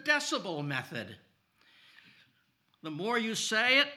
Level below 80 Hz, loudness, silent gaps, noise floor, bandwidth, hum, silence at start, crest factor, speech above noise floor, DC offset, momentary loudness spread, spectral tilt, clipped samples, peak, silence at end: -90 dBFS; -30 LUFS; none; -73 dBFS; 17 kHz; none; 0 s; 22 dB; 41 dB; under 0.1%; 18 LU; -2.5 dB/octave; under 0.1%; -12 dBFS; 0 s